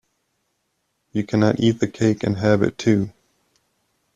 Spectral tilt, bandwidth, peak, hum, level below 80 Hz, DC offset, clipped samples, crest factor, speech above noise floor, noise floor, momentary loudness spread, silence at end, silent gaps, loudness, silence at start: -7 dB/octave; 9.2 kHz; -4 dBFS; none; -54 dBFS; under 0.1%; under 0.1%; 18 dB; 53 dB; -72 dBFS; 9 LU; 1.05 s; none; -20 LUFS; 1.15 s